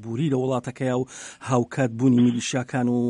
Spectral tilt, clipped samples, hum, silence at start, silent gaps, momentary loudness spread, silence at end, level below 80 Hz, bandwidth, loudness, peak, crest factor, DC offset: -6.5 dB/octave; under 0.1%; none; 0 s; none; 8 LU; 0 s; -62 dBFS; 10.5 kHz; -23 LUFS; -6 dBFS; 16 dB; under 0.1%